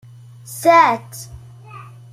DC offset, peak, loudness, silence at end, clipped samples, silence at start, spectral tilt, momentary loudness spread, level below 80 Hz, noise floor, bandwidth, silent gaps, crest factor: under 0.1%; -2 dBFS; -14 LUFS; 0.3 s; under 0.1%; 0.5 s; -4 dB/octave; 26 LU; -54 dBFS; -38 dBFS; 16 kHz; none; 18 dB